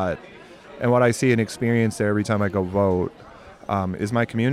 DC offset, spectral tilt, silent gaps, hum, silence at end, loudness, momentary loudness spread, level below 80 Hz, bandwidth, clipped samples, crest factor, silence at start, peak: under 0.1%; -6.5 dB/octave; none; none; 0 s; -22 LUFS; 9 LU; -56 dBFS; 14 kHz; under 0.1%; 16 dB; 0 s; -6 dBFS